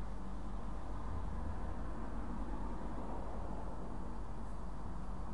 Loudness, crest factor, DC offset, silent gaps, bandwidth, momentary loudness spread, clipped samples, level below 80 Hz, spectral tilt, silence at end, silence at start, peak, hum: -46 LUFS; 12 dB; 0.9%; none; 11 kHz; 3 LU; under 0.1%; -46 dBFS; -7.5 dB/octave; 0 s; 0 s; -30 dBFS; none